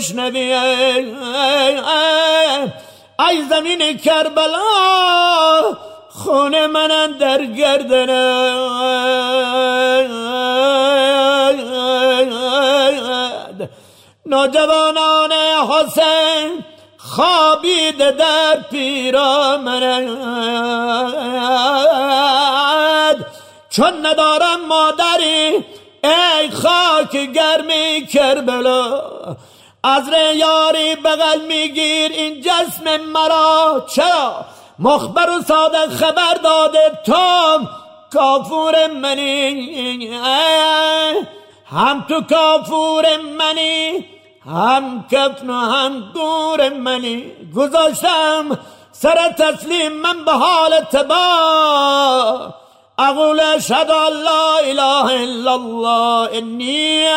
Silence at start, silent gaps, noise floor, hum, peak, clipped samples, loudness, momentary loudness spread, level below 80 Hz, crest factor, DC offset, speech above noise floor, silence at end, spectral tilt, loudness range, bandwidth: 0 s; none; -46 dBFS; none; -2 dBFS; under 0.1%; -14 LUFS; 8 LU; -60 dBFS; 12 dB; under 0.1%; 32 dB; 0 s; -2.5 dB/octave; 2 LU; 16 kHz